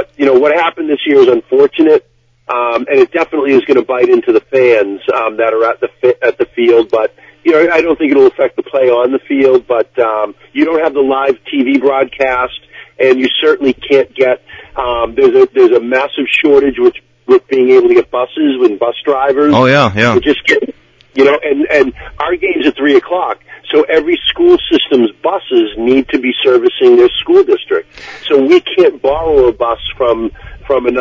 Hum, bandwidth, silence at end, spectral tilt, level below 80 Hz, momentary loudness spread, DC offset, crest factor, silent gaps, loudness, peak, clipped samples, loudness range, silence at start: none; 7.4 kHz; 0 s; -6 dB/octave; -42 dBFS; 8 LU; under 0.1%; 10 dB; none; -11 LUFS; 0 dBFS; 0.4%; 2 LU; 0 s